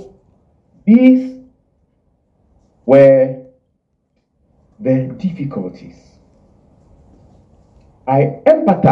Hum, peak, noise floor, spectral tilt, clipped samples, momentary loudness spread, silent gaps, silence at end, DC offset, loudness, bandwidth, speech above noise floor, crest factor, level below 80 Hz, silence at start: none; 0 dBFS; -65 dBFS; -10 dB/octave; under 0.1%; 19 LU; none; 0 s; under 0.1%; -13 LUFS; 5.6 kHz; 54 dB; 16 dB; -54 dBFS; 0 s